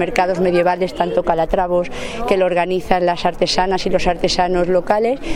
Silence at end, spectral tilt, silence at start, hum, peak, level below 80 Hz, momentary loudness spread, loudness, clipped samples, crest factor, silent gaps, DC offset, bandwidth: 0 s; -5 dB/octave; 0 s; none; 0 dBFS; -32 dBFS; 3 LU; -17 LUFS; under 0.1%; 16 dB; none; under 0.1%; 15.5 kHz